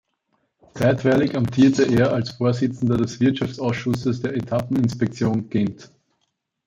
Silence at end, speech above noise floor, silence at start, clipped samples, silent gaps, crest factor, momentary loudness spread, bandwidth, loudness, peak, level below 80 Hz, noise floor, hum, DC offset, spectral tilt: 0.8 s; 54 dB; 0.75 s; under 0.1%; none; 16 dB; 7 LU; 12.5 kHz; -21 LUFS; -4 dBFS; -52 dBFS; -74 dBFS; none; under 0.1%; -7 dB/octave